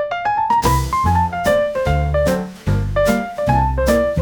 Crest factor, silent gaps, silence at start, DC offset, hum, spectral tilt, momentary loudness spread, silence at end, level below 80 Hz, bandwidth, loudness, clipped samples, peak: 16 dB; none; 0 s; 0.1%; none; -6 dB/octave; 4 LU; 0 s; -26 dBFS; over 20 kHz; -17 LUFS; under 0.1%; -2 dBFS